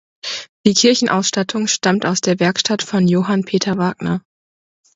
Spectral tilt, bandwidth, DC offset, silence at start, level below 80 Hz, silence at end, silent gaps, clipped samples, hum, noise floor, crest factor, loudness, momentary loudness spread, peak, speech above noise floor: -4 dB/octave; 8 kHz; under 0.1%; 0.25 s; -56 dBFS; 0.75 s; 0.49-0.64 s; under 0.1%; none; under -90 dBFS; 18 dB; -17 LUFS; 10 LU; 0 dBFS; over 74 dB